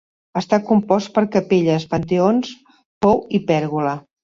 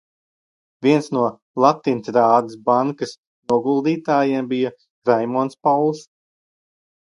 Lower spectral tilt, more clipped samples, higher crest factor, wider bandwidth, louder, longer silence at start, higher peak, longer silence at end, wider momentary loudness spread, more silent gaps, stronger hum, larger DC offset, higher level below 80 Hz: about the same, -7 dB/octave vs -6.5 dB/octave; neither; about the same, 18 dB vs 20 dB; second, 7.4 kHz vs 11.5 kHz; about the same, -19 LUFS vs -19 LUFS; second, 0.35 s vs 0.8 s; about the same, -2 dBFS vs 0 dBFS; second, 0.25 s vs 1.15 s; about the same, 7 LU vs 8 LU; second, 2.85-3.01 s vs 1.42-1.54 s, 3.18-3.43 s, 4.90-5.02 s; neither; neither; first, -52 dBFS vs -68 dBFS